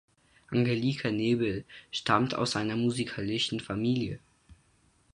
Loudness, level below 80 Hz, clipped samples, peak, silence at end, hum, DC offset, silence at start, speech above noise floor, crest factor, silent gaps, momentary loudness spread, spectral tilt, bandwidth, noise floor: -30 LUFS; -60 dBFS; under 0.1%; -10 dBFS; 0.6 s; none; under 0.1%; 0.5 s; 37 dB; 20 dB; none; 8 LU; -5.5 dB/octave; 11 kHz; -66 dBFS